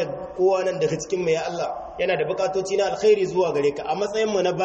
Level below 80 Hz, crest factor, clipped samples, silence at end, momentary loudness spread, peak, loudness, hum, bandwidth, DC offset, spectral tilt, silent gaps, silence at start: -56 dBFS; 14 dB; under 0.1%; 0 s; 7 LU; -8 dBFS; -23 LUFS; none; 8.4 kHz; under 0.1%; -5 dB/octave; none; 0 s